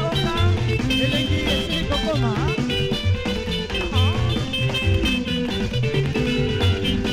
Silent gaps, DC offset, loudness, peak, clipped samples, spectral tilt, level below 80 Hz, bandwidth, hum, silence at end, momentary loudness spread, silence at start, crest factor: none; under 0.1%; -21 LUFS; -8 dBFS; under 0.1%; -5.5 dB/octave; -32 dBFS; 15.5 kHz; none; 0 s; 3 LU; 0 s; 12 dB